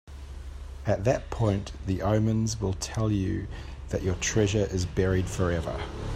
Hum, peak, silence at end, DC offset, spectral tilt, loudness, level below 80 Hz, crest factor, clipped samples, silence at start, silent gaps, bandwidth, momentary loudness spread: none; -10 dBFS; 0 s; under 0.1%; -6 dB/octave; -28 LUFS; -40 dBFS; 18 dB; under 0.1%; 0.05 s; none; 13.5 kHz; 15 LU